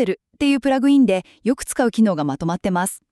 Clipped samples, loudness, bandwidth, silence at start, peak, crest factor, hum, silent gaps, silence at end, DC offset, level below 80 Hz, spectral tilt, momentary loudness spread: under 0.1%; -19 LUFS; 13.5 kHz; 0 s; -6 dBFS; 12 dB; none; none; 0.15 s; under 0.1%; -50 dBFS; -5.5 dB/octave; 8 LU